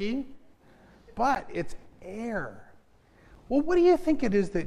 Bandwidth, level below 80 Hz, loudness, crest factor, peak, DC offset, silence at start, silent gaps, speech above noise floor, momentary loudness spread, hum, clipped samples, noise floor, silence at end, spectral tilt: 10.5 kHz; -48 dBFS; -27 LUFS; 16 dB; -12 dBFS; under 0.1%; 0 s; none; 32 dB; 20 LU; none; under 0.1%; -58 dBFS; 0 s; -6.5 dB/octave